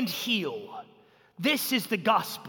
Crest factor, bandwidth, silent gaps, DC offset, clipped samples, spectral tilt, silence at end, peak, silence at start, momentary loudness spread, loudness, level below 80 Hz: 18 dB; 17.5 kHz; none; under 0.1%; under 0.1%; -3.5 dB/octave; 0 s; -12 dBFS; 0 s; 16 LU; -27 LUFS; -78 dBFS